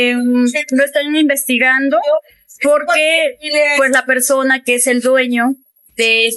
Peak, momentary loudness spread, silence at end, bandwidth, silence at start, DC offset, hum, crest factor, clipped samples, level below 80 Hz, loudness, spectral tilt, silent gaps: 0 dBFS; 5 LU; 0 s; 12.5 kHz; 0 s; under 0.1%; none; 14 dB; under 0.1%; -66 dBFS; -13 LUFS; -1 dB/octave; none